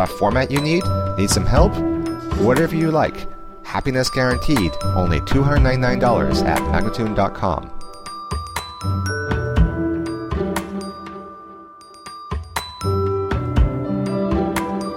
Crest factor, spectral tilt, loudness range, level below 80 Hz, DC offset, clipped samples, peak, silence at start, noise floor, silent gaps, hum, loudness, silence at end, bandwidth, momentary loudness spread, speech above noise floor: 18 dB; -6 dB/octave; 7 LU; -28 dBFS; under 0.1%; under 0.1%; -2 dBFS; 0 s; -41 dBFS; none; none; -20 LUFS; 0 s; 16.5 kHz; 17 LU; 24 dB